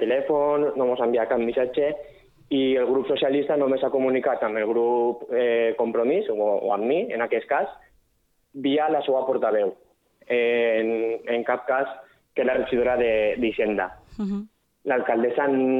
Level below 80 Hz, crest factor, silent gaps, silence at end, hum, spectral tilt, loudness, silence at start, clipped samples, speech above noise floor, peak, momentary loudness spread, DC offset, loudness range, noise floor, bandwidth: -58 dBFS; 14 dB; none; 0 s; none; -7.5 dB/octave; -24 LUFS; 0 s; under 0.1%; 45 dB; -10 dBFS; 7 LU; under 0.1%; 2 LU; -68 dBFS; 4.1 kHz